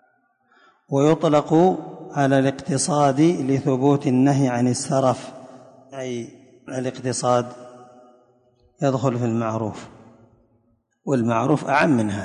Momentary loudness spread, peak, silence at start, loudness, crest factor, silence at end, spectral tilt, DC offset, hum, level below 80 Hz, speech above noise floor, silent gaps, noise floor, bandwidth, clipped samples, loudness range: 15 LU; -4 dBFS; 0.9 s; -21 LUFS; 16 dB; 0 s; -6 dB/octave; under 0.1%; none; -60 dBFS; 45 dB; none; -65 dBFS; 11 kHz; under 0.1%; 8 LU